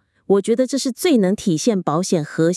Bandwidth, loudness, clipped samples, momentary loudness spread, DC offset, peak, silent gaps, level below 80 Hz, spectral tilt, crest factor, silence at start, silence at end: 12 kHz; -18 LUFS; under 0.1%; 3 LU; under 0.1%; -4 dBFS; none; -60 dBFS; -5.5 dB/octave; 14 dB; 0.3 s; 0 s